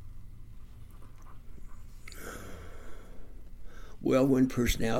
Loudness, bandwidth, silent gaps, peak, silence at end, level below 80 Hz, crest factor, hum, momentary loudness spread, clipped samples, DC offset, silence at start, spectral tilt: -29 LUFS; 16.5 kHz; none; -14 dBFS; 0 s; -44 dBFS; 18 dB; 60 Hz at -65 dBFS; 27 LU; under 0.1%; under 0.1%; 0 s; -6 dB/octave